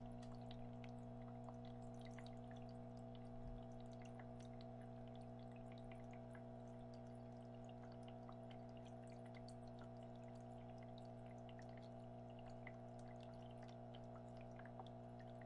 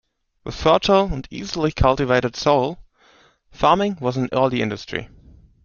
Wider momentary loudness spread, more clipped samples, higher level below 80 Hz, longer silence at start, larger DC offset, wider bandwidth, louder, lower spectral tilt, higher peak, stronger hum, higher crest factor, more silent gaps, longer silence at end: second, 2 LU vs 13 LU; neither; second, -68 dBFS vs -36 dBFS; second, 0 s vs 0.45 s; neither; first, 11 kHz vs 7.2 kHz; second, -57 LUFS vs -20 LUFS; first, -7.5 dB/octave vs -6 dB/octave; second, -40 dBFS vs -2 dBFS; first, 60 Hz at -60 dBFS vs none; second, 14 dB vs 20 dB; neither; second, 0 s vs 0.6 s